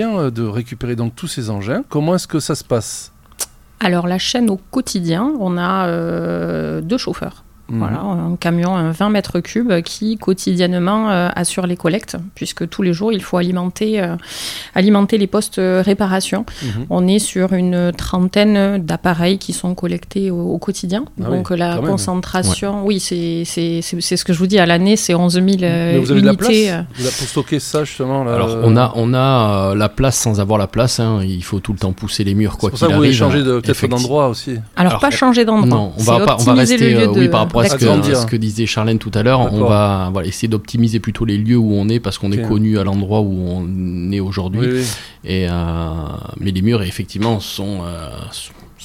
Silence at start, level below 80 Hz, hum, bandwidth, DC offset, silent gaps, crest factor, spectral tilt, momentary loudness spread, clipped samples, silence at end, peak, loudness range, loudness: 0 s; -38 dBFS; none; 16 kHz; under 0.1%; none; 16 dB; -5.5 dB/octave; 10 LU; under 0.1%; 0 s; 0 dBFS; 6 LU; -16 LUFS